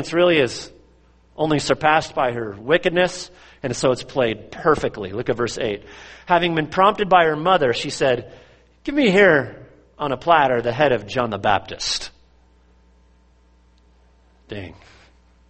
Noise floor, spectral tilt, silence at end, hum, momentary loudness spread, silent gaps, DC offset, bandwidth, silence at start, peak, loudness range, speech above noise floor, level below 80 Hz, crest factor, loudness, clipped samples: -55 dBFS; -4.5 dB/octave; 0.75 s; none; 17 LU; none; under 0.1%; 8.8 kHz; 0 s; -2 dBFS; 6 LU; 35 dB; -50 dBFS; 20 dB; -19 LUFS; under 0.1%